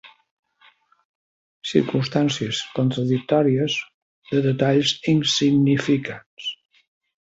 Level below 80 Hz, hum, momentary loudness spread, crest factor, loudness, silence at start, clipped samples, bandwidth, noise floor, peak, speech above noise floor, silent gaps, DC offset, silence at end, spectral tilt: -62 dBFS; none; 13 LU; 20 dB; -21 LUFS; 0.05 s; under 0.1%; 8 kHz; -57 dBFS; -4 dBFS; 37 dB; 0.31-0.43 s, 1.05-1.62 s, 3.94-4.22 s, 6.26-6.37 s; under 0.1%; 0.7 s; -5.5 dB/octave